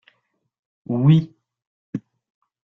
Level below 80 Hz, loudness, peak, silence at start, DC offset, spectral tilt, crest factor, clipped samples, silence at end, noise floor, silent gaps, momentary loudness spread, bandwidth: -60 dBFS; -18 LUFS; -4 dBFS; 0.9 s; under 0.1%; -10 dB/octave; 20 dB; under 0.1%; 0.65 s; -71 dBFS; 1.67-1.93 s; 18 LU; 4 kHz